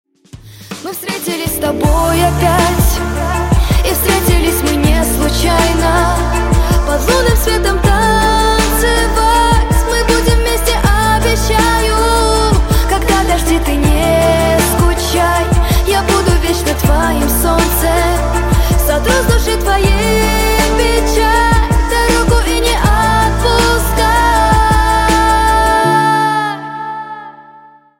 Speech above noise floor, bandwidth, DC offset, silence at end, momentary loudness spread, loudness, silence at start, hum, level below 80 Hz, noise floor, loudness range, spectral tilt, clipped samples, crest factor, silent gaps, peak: 29 dB; 16.5 kHz; under 0.1%; 0.6 s; 4 LU; -12 LUFS; 0.35 s; none; -16 dBFS; -41 dBFS; 1 LU; -4.5 dB/octave; under 0.1%; 12 dB; none; 0 dBFS